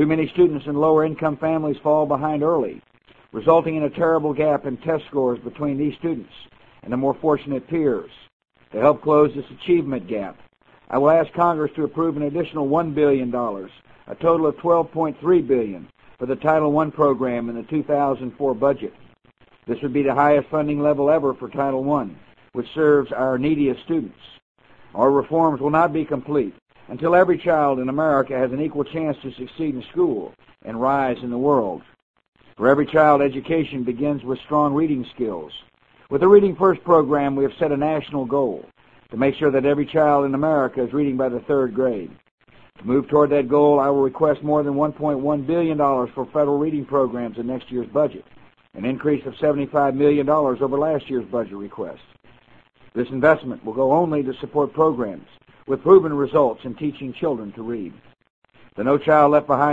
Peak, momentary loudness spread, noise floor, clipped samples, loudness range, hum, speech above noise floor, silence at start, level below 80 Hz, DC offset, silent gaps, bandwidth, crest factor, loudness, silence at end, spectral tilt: 0 dBFS; 12 LU; -55 dBFS; under 0.1%; 4 LU; none; 36 dB; 0 s; -54 dBFS; under 0.1%; 8.32-8.40 s, 24.42-24.55 s, 26.62-26.66 s, 32.02-32.14 s, 32.28-32.32 s, 42.31-42.38 s, 58.30-58.42 s; 7.4 kHz; 20 dB; -20 LUFS; 0 s; -9.5 dB/octave